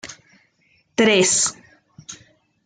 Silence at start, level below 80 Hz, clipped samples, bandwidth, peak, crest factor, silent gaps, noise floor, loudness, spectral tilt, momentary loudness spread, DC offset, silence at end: 0.05 s; -64 dBFS; under 0.1%; 10.5 kHz; -4 dBFS; 18 dB; none; -62 dBFS; -17 LUFS; -2 dB/octave; 24 LU; under 0.1%; 0.5 s